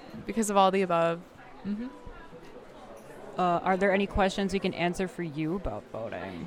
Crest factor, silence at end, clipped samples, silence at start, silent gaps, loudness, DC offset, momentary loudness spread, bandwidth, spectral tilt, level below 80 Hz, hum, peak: 20 dB; 0 s; under 0.1%; 0 s; none; -29 LUFS; under 0.1%; 24 LU; 15.5 kHz; -5.5 dB/octave; -48 dBFS; none; -10 dBFS